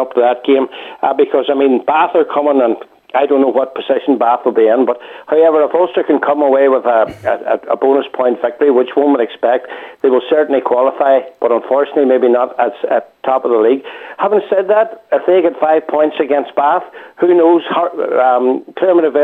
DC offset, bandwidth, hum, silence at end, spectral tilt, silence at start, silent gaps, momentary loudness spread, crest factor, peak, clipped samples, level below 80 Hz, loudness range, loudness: under 0.1%; 4.1 kHz; none; 0 s; -7 dB/octave; 0 s; none; 6 LU; 12 dB; -2 dBFS; under 0.1%; -64 dBFS; 1 LU; -13 LUFS